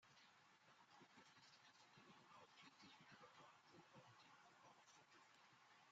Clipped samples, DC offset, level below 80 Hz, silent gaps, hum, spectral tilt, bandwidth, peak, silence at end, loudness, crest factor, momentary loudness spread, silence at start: under 0.1%; under 0.1%; under -90 dBFS; none; none; -2 dB/octave; 7.6 kHz; -54 dBFS; 0 s; -68 LUFS; 16 dB; 3 LU; 0 s